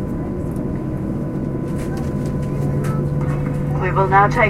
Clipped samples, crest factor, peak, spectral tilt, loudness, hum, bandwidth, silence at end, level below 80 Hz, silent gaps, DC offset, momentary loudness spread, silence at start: under 0.1%; 18 dB; 0 dBFS; -8 dB/octave; -21 LUFS; none; 12.5 kHz; 0 s; -32 dBFS; none; under 0.1%; 9 LU; 0 s